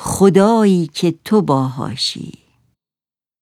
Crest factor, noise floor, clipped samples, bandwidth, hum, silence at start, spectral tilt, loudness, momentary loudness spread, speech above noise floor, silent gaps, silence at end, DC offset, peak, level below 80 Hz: 16 dB; under -90 dBFS; under 0.1%; 15 kHz; none; 0 s; -6 dB/octave; -15 LUFS; 10 LU; over 76 dB; none; 1.1 s; under 0.1%; 0 dBFS; -48 dBFS